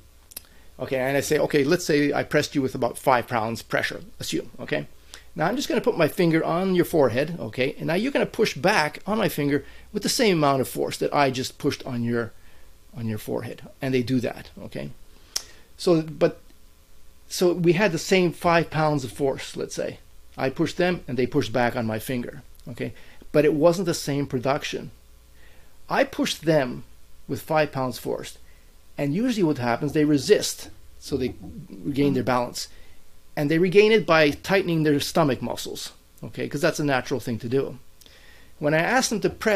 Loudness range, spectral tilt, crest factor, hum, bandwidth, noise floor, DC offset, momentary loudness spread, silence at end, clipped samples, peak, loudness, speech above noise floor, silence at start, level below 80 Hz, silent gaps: 6 LU; -5 dB/octave; 22 dB; none; 16 kHz; -48 dBFS; under 0.1%; 14 LU; 0 s; under 0.1%; -2 dBFS; -24 LUFS; 25 dB; 0.35 s; -50 dBFS; none